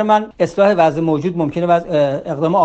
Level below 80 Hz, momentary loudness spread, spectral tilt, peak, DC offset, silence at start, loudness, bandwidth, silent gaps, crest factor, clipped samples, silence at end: -50 dBFS; 7 LU; -7.5 dB/octave; 0 dBFS; under 0.1%; 0 s; -16 LUFS; 8.4 kHz; none; 14 dB; under 0.1%; 0 s